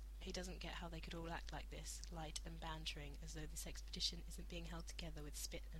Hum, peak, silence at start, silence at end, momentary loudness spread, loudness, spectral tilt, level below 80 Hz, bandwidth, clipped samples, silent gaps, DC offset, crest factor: none; -28 dBFS; 0 s; 0 s; 8 LU; -50 LUFS; -3 dB/octave; -52 dBFS; 16 kHz; under 0.1%; none; under 0.1%; 22 dB